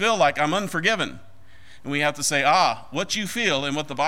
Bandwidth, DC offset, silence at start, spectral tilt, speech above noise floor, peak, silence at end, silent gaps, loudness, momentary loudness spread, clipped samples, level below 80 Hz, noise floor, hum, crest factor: 16 kHz; 1%; 0 s; -3 dB/octave; 29 dB; -6 dBFS; 0 s; none; -22 LUFS; 10 LU; under 0.1%; -58 dBFS; -51 dBFS; none; 18 dB